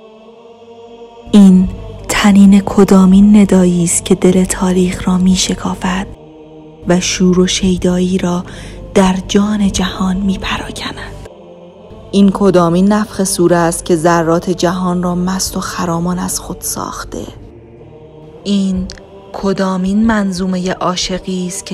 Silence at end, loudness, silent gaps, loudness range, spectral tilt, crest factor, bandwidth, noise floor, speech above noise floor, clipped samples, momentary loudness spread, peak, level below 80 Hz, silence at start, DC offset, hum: 0 s; -12 LUFS; none; 10 LU; -5.5 dB/octave; 12 dB; 13.5 kHz; -38 dBFS; 26 dB; 0.3%; 15 LU; 0 dBFS; -32 dBFS; 0.7 s; under 0.1%; none